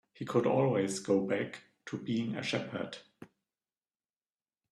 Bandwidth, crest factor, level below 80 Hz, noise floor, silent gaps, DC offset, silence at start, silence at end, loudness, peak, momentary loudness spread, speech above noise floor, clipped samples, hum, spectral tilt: 12.5 kHz; 18 dB; -74 dBFS; under -90 dBFS; none; under 0.1%; 0.2 s; 1.45 s; -33 LUFS; -16 dBFS; 14 LU; over 58 dB; under 0.1%; none; -5.5 dB/octave